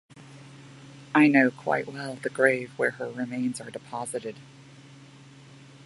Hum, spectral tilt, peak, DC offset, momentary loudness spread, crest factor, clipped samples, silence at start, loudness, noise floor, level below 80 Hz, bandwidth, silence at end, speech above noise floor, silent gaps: none; -5.5 dB/octave; -6 dBFS; under 0.1%; 28 LU; 24 dB; under 0.1%; 0.15 s; -26 LUFS; -50 dBFS; -74 dBFS; 11.5 kHz; 0.8 s; 24 dB; none